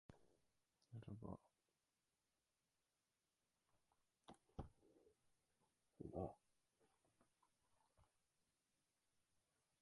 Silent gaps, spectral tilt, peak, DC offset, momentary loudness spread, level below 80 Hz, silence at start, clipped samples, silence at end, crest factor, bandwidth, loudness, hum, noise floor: none; -8 dB/octave; -36 dBFS; under 0.1%; 12 LU; -76 dBFS; 0.1 s; under 0.1%; 1.75 s; 28 dB; 11 kHz; -58 LUFS; none; under -90 dBFS